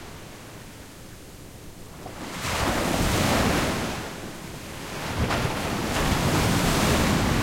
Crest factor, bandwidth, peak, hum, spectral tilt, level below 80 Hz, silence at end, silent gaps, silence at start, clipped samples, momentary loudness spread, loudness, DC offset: 16 dB; 16.5 kHz; -10 dBFS; none; -4.5 dB/octave; -36 dBFS; 0 s; none; 0 s; under 0.1%; 21 LU; -24 LUFS; under 0.1%